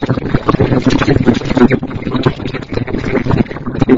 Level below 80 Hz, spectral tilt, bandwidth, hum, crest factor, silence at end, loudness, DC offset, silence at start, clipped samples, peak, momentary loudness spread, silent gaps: -28 dBFS; -7.5 dB/octave; 7.6 kHz; none; 12 dB; 0 s; -14 LUFS; under 0.1%; 0 s; 0.5%; 0 dBFS; 8 LU; none